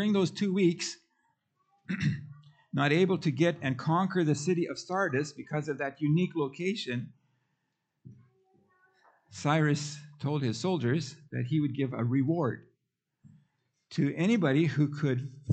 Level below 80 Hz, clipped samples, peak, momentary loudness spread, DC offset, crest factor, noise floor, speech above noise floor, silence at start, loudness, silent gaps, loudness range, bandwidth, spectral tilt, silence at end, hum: -74 dBFS; under 0.1%; -12 dBFS; 11 LU; under 0.1%; 18 dB; -82 dBFS; 53 dB; 0 s; -30 LUFS; none; 6 LU; 9 kHz; -6.5 dB/octave; 0 s; none